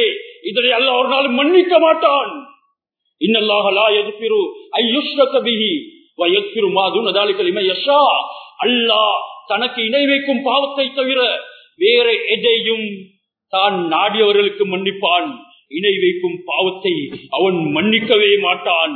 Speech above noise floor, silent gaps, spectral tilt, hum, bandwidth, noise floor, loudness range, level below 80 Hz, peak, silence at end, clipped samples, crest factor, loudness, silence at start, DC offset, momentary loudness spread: 56 dB; none; -7 dB/octave; none; 4.5 kHz; -71 dBFS; 2 LU; -72 dBFS; 0 dBFS; 0 s; under 0.1%; 16 dB; -15 LUFS; 0 s; under 0.1%; 9 LU